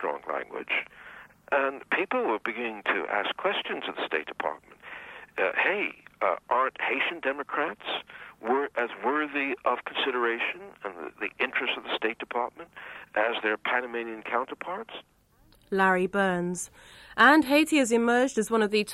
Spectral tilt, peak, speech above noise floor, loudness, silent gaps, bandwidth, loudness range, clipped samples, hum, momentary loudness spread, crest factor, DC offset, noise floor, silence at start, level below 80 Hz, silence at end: -4 dB/octave; -6 dBFS; 33 dB; -27 LUFS; none; 14.5 kHz; 6 LU; under 0.1%; none; 15 LU; 22 dB; under 0.1%; -61 dBFS; 0 s; -66 dBFS; 0 s